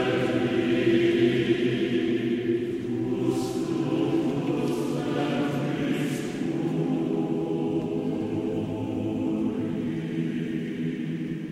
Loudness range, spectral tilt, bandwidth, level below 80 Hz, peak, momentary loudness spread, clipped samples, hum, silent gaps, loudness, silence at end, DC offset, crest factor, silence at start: 4 LU; -7 dB/octave; 13.5 kHz; -58 dBFS; -12 dBFS; 7 LU; under 0.1%; none; none; -27 LUFS; 0 s; under 0.1%; 14 dB; 0 s